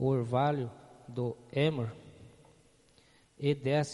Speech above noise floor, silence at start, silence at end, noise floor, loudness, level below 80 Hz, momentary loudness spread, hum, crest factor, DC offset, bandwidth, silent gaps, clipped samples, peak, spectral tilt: 33 dB; 0 s; 0 s; -64 dBFS; -33 LUFS; -68 dBFS; 13 LU; none; 18 dB; under 0.1%; 11.5 kHz; none; under 0.1%; -16 dBFS; -7 dB/octave